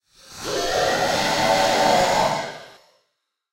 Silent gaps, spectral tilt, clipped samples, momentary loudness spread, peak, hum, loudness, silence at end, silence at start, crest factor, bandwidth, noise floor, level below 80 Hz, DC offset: none; -2.5 dB/octave; under 0.1%; 14 LU; -6 dBFS; none; -20 LUFS; 0.85 s; 0.3 s; 16 dB; 16 kHz; -75 dBFS; -48 dBFS; under 0.1%